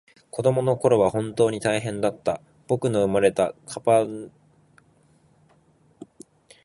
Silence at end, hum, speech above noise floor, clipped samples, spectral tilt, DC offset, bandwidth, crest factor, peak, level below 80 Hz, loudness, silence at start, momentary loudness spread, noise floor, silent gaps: 0.6 s; none; 38 dB; under 0.1%; -6 dB/octave; under 0.1%; 11.5 kHz; 20 dB; -6 dBFS; -58 dBFS; -23 LUFS; 0.35 s; 10 LU; -60 dBFS; none